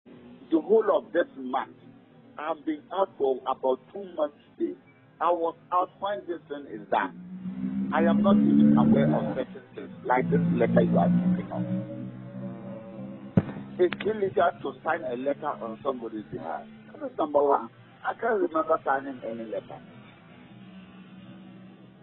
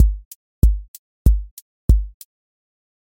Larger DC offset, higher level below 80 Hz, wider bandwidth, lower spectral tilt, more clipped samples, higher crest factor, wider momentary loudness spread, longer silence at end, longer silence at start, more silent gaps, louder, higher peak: neither; second, -62 dBFS vs -20 dBFS; second, 4.1 kHz vs 17 kHz; first, -11.5 dB/octave vs -8 dB/octave; neither; about the same, 20 dB vs 18 dB; first, 18 LU vs 15 LU; second, 0.15 s vs 0.9 s; about the same, 0.05 s vs 0 s; second, none vs 0.25-0.62 s, 0.88-1.25 s, 1.51-1.88 s; second, -27 LUFS vs -21 LUFS; second, -8 dBFS vs -2 dBFS